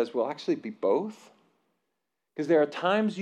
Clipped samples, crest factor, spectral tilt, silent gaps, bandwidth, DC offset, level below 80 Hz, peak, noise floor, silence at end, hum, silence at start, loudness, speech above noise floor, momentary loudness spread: under 0.1%; 16 dB; -6.5 dB/octave; none; 9.8 kHz; under 0.1%; under -90 dBFS; -12 dBFS; -83 dBFS; 0 s; none; 0 s; -28 LUFS; 56 dB; 12 LU